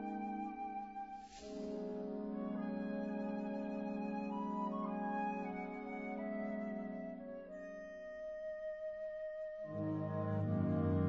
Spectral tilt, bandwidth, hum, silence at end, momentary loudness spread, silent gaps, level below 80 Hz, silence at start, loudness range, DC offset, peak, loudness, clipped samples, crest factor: -8 dB/octave; 7.6 kHz; none; 0 s; 10 LU; none; -70 dBFS; 0 s; 4 LU; under 0.1%; -24 dBFS; -43 LUFS; under 0.1%; 18 dB